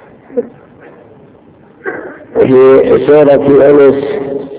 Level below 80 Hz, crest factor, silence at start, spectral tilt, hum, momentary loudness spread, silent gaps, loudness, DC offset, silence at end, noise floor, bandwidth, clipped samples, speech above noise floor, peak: -44 dBFS; 10 dB; 0.3 s; -11.5 dB/octave; none; 18 LU; none; -7 LUFS; under 0.1%; 0 s; -40 dBFS; 4 kHz; 3%; 34 dB; 0 dBFS